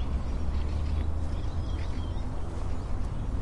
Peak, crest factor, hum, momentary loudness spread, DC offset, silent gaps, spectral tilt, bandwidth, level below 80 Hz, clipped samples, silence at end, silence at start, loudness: -16 dBFS; 12 dB; none; 4 LU; under 0.1%; none; -7.5 dB/octave; 10.5 kHz; -32 dBFS; under 0.1%; 0 s; 0 s; -34 LUFS